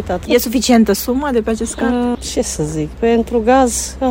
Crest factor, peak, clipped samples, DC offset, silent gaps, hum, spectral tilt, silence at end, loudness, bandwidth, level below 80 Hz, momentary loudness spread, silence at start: 14 dB; 0 dBFS; under 0.1%; under 0.1%; none; none; -4.5 dB/octave; 0 s; -15 LUFS; 16.5 kHz; -32 dBFS; 7 LU; 0 s